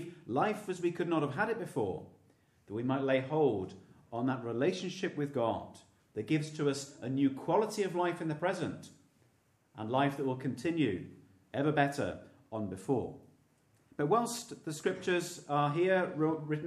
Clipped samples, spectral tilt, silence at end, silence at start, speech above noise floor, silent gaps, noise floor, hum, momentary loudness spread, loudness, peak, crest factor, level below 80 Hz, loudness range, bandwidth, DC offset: under 0.1%; -6 dB/octave; 0 s; 0 s; 37 dB; none; -71 dBFS; none; 12 LU; -34 LUFS; -14 dBFS; 20 dB; -74 dBFS; 2 LU; 14.5 kHz; under 0.1%